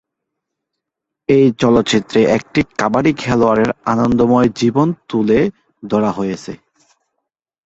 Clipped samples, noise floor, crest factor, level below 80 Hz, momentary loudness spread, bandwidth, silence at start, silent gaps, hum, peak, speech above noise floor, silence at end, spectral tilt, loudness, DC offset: under 0.1%; -80 dBFS; 16 dB; -44 dBFS; 8 LU; 8 kHz; 1.3 s; none; none; 0 dBFS; 66 dB; 1.1 s; -6.5 dB/octave; -15 LUFS; under 0.1%